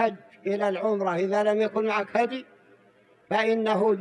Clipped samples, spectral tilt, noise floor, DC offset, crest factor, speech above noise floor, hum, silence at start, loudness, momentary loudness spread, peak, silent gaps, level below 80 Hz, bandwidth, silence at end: under 0.1%; -6 dB/octave; -59 dBFS; under 0.1%; 16 dB; 34 dB; none; 0 s; -26 LUFS; 6 LU; -10 dBFS; none; -80 dBFS; 10.5 kHz; 0 s